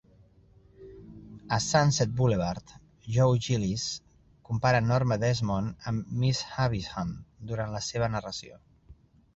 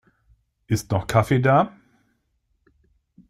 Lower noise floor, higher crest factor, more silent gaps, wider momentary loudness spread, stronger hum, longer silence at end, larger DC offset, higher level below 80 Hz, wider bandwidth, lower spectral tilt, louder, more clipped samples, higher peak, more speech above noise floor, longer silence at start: second, -59 dBFS vs -70 dBFS; about the same, 18 dB vs 20 dB; neither; first, 16 LU vs 9 LU; neither; second, 0.4 s vs 1.6 s; neither; about the same, -52 dBFS vs -52 dBFS; second, 8.2 kHz vs 15.5 kHz; about the same, -5.5 dB/octave vs -6.5 dB/octave; second, -28 LUFS vs -21 LUFS; neither; second, -10 dBFS vs -4 dBFS; second, 31 dB vs 51 dB; about the same, 0.8 s vs 0.7 s